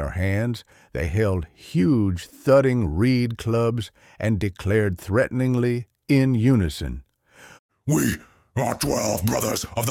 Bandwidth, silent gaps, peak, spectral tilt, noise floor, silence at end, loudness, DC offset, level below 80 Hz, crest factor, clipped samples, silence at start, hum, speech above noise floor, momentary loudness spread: 17 kHz; 7.59-7.69 s; -6 dBFS; -6 dB/octave; -50 dBFS; 0 s; -23 LUFS; under 0.1%; -40 dBFS; 16 dB; under 0.1%; 0 s; none; 29 dB; 12 LU